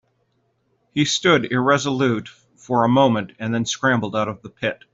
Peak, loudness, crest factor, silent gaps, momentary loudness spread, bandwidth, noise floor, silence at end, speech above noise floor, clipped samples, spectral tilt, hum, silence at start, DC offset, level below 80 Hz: -4 dBFS; -20 LUFS; 18 dB; none; 10 LU; 8 kHz; -67 dBFS; 0.2 s; 47 dB; under 0.1%; -4.5 dB/octave; none; 0.95 s; under 0.1%; -60 dBFS